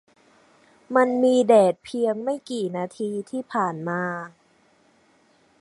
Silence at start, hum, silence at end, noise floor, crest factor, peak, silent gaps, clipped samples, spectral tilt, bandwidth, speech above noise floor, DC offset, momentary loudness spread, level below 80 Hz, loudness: 0.9 s; none; 1.3 s; -60 dBFS; 20 dB; -4 dBFS; none; under 0.1%; -6 dB/octave; 11.5 kHz; 38 dB; under 0.1%; 13 LU; -74 dBFS; -23 LUFS